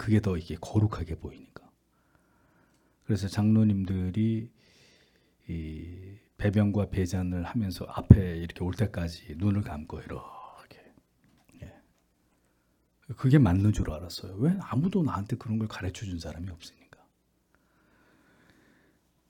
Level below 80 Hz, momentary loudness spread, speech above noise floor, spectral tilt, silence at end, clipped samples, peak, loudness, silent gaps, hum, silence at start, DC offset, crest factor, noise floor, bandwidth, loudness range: -46 dBFS; 24 LU; 43 dB; -8 dB/octave; 2.6 s; under 0.1%; 0 dBFS; -28 LUFS; none; none; 0 s; under 0.1%; 28 dB; -70 dBFS; 13.5 kHz; 12 LU